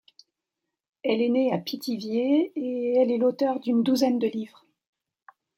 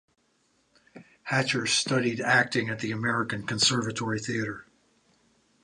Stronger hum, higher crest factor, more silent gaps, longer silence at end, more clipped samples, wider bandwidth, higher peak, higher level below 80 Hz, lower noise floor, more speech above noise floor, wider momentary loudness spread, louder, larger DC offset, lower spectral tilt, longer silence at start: neither; about the same, 16 dB vs 20 dB; neither; about the same, 1.1 s vs 1 s; neither; first, 16 kHz vs 11 kHz; about the same, -10 dBFS vs -8 dBFS; second, -76 dBFS vs -64 dBFS; first, -85 dBFS vs -69 dBFS; first, 61 dB vs 42 dB; about the same, 8 LU vs 8 LU; about the same, -25 LUFS vs -26 LUFS; neither; first, -6 dB/octave vs -3.5 dB/octave; about the same, 1.05 s vs 0.95 s